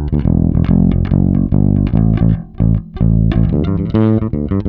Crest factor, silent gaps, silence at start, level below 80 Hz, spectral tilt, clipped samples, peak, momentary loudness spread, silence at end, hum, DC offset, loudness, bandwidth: 12 dB; none; 0 s; -20 dBFS; -12 dB/octave; under 0.1%; 0 dBFS; 3 LU; 0 s; none; under 0.1%; -14 LUFS; 4.5 kHz